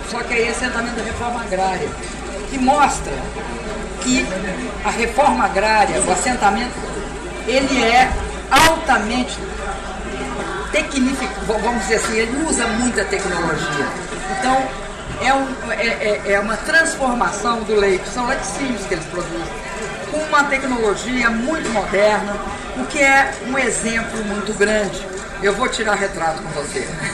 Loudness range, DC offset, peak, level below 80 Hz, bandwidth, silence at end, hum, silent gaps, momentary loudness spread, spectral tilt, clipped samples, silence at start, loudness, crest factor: 4 LU; under 0.1%; -4 dBFS; -34 dBFS; 13.5 kHz; 0 s; none; none; 11 LU; -3.5 dB/octave; under 0.1%; 0 s; -18 LUFS; 16 dB